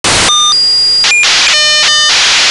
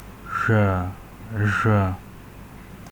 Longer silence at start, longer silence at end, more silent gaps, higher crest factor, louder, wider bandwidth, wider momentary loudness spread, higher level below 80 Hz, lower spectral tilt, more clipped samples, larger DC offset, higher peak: about the same, 0.05 s vs 0 s; about the same, 0 s vs 0 s; neither; second, 6 dB vs 16 dB; first, -5 LUFS vs -23 LUFS; second, 12 kHz vs 19.5 kHz; second, 0 LU vs 23 LU; first, -38 dBFS vs -46 dBFS; second, 1 dB/octave vs -7.5 dB/octave; neither; first, 0.5% vs under 0.1%; first, -2 dBFS vs -8 dBFS